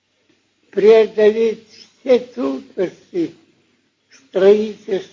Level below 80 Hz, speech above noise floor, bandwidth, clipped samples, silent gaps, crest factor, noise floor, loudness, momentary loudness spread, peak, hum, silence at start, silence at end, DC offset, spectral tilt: -68 dBFS; 46 dB; 7.2 kHz; under 0.1%; none; 16 dB; -62 dBFS; -17 LUFS; 14 LU; 0 dBFS; none; 0.75 s; 0.1 s; under 0.1%; -6 dB/octave